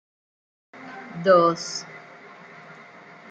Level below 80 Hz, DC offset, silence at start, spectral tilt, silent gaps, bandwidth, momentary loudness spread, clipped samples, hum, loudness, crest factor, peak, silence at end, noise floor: -72 dBFS; under 0.1%; 0.75 s; -4.5 dB/octave; none; 9 kHz; 27 LU; under 0.1%; none; -21 LUFS; 22 dB; -4 dBFS; 0.55 s; -46 dBFS